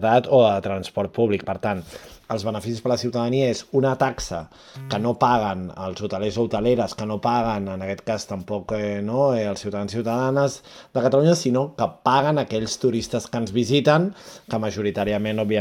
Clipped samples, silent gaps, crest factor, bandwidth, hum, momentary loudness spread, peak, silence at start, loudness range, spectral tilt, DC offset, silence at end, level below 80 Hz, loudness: under 0.1%; none; 20 dB; 16 kHz; none; 11 LU; -4 dBFS; 0 s; 3 LU; -6 dB/octave; under 0.1%; 0 s; -52 dBFS; -23 LUFS